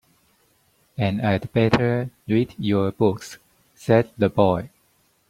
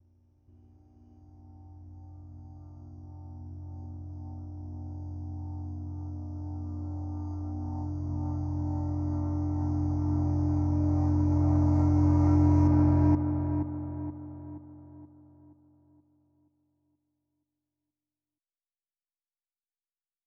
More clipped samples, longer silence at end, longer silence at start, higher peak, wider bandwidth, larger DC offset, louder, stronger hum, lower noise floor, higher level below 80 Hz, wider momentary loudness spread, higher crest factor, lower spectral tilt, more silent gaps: neither; second, 0.6 s vs 5.2 s; second, 1 s vs 1.2 s; first, -2 dBFS vs -12 dBFS; first, 15 kHz vs 6.2 kHz; neither; first, -22 LUFS vs -29 LUFS; neither; second, -63 dBFS vs under -90 dBFS; second, -52 dBFS vs -44 dBFS; second, 15 LU vs 25 LU; about the same, 20 dB vs 18 dB; second, -7.5 dB/octave vs -11 dB/octave; neither